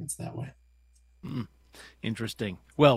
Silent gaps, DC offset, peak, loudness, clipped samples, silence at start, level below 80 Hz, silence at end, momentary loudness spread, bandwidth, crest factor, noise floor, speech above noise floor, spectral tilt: none; under 0.1%; -4 dBFS; -33 LUFS; under 0.1%; 0 s; -58 dBFS; 0 s; 13 LU; 15 kHz; 26 dB; -61 dBFS; 33 dB; -5.5 dB/octave